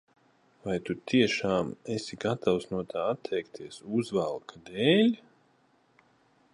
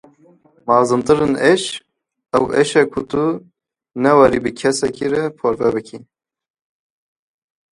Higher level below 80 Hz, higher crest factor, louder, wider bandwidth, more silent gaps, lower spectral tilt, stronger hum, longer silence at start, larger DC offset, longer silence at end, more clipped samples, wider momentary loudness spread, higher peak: second, -64 dBFS vs -50 dBFS; about the same, 20 dB vs 18 dB; second, -29 LUFS vs -16 LUFS; about the same, 11 kHz vs 11.5 kHz; neither; about the same, -5.5 dB/octave vs -5 dB/octave; neither; about the same, 0.65 s vs 0.65 s; neither; second, 1.4 s vs 1.75 s; neither; about the same, 15 LU vs 13 LU; second, -10 dBFS vs 0 dBFS